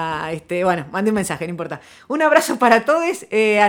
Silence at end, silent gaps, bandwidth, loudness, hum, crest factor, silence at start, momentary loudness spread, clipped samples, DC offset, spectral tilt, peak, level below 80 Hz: 0 s; none; 19.5 kHz; -18 LUFS; none; 18 dB; 0 s; 12 LU; under 0.1%; under 0.1%; -4.5 dB/octave; 0 dBFS; -56 dBFS